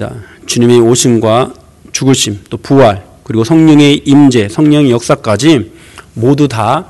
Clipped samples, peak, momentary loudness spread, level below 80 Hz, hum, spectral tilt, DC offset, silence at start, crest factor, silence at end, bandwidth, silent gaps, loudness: 2%; 0 dBFS; 13 LU; -42 dBFS; none; -5.5 dB/octave; under 0.1%; 0 s; 8 dB; 0.05 s; 12.5 kHz; none; -9 LUFS